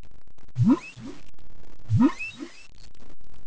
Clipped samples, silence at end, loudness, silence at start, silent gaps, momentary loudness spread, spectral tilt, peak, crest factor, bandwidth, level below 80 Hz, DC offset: under 0.1%; 0 s; -24 LUFS; 0 s; none; 20 LU; -8 dB/octave; -10 dBFS; 16 dB; 8 kHz; -50 dBFS; under 0.1%